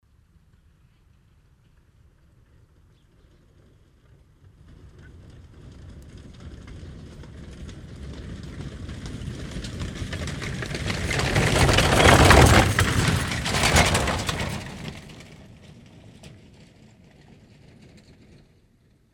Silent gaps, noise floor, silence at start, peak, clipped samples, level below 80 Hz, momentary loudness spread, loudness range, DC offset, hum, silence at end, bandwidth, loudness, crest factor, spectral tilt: none; -60 dBFS; 5 s; 0 dBFS; under 0.1%; -34 dBFS; 28 LU; 25 LU; under 0.1%; none; 2.85 s; 18 kHz; -20 LUFS; 26 dB; -4 dB/octave